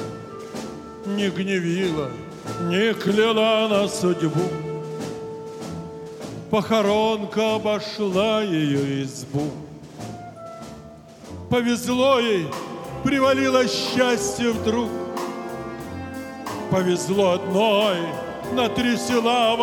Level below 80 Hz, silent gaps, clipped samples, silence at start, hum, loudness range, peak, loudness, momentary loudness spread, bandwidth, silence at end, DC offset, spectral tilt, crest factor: -54 dBFS; none; under 0.1%; 0 s; none; 5 LU; -4 dBFS; -22 LUFS; 17 LU; 18 kHz; 0 s; under 0.1%; -5 dB/octave; 20 dB